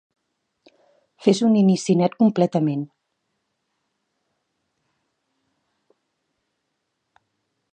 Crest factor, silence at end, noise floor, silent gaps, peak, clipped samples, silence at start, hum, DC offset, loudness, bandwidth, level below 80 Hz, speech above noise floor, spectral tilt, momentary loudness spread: 22 dB; 4.9 s; -76 dBFS; none; -2 dBFS; under 0.1%; 1.2 s; none; under 0.1%; -19 LUFS; 9.4 kHz; -74 dBFS; 58 dB; -7 dB/octave; 8 LU